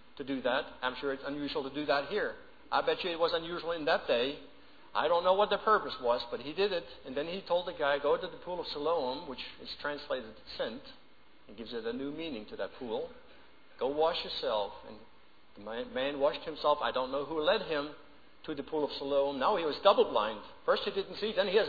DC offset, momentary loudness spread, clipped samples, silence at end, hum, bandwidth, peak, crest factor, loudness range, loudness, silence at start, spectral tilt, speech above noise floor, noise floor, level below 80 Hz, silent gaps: 0.2%; 13 LU; under 0.1%; 0 s; none; 5 kHz; -10 dBFS; 22 dB; 9 LU; -33 LUFS; 0.15 s; -6 dB/octave; 27 dB; -60 dBFS; -64 dBFS; none